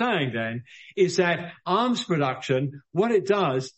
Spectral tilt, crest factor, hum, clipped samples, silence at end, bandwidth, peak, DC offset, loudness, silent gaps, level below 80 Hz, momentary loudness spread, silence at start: -5.5 dB/octave; 16 dB; none; under 0.1%; 0.1 s; 8.4 kHz; -8 dBFS; under 0.1%; -25 LUFS; none; -68 dBFS; 8 LU; 0 s